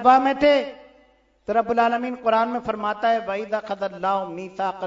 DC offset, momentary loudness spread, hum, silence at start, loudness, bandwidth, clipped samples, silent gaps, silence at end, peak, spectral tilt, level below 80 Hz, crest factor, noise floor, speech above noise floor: under 0.1%; 10 LU; none; 0 s; -22 LUFS; 7.8 kHz; under 0.1%; none; 0 s; -2 dBFS; -5.5 dB/octave; -58 dBFS; 20 dB; -58 dBFS; 37 dB